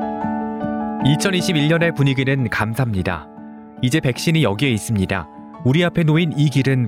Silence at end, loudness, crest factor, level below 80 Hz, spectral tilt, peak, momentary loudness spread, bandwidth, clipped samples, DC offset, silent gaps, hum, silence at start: 0 s; -19 LUFS; 14 dB; -46 dBFS; -6 dB/octave; -4 dBFS; 8 LU; 15.5 kHz; under 0.1%; under 0.1%; none; none; 0 s